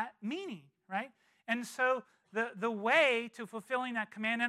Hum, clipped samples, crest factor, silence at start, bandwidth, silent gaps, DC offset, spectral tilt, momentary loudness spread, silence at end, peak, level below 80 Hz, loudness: none; under 0.1%; 20 dB; 0 s; 14.5 kHz; none; under 0.1%; -4 dB/octave; 17 LU; 0 s; -14 dBFS; under -90 dBFS; -34 LUFS